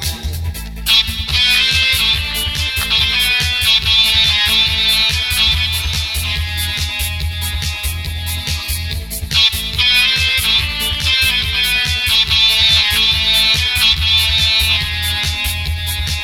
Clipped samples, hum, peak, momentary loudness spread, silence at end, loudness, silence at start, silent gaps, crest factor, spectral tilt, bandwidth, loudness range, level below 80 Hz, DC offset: under 0.1%; none; 0 dBFS; 10 LU; 0 s; -13 LUFS; 0 s; none; 14 dB; -1.5 dB/octave; 18.5 kHz; 7 LU; -26 dBFS; 0.3%